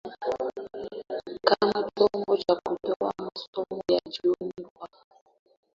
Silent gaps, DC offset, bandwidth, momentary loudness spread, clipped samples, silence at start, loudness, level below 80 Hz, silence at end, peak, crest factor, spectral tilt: 2.96-3.00 s, 3.48-3.53 s, 4.70-4.76 s; under 0.1%; 7.4 kHz; 14 LU; under 0.1%; 0.05 s; -28 LUFS; -66 dBFS; 0.9 s; -4 dBFS; 24 dB; -5.5 dB/octave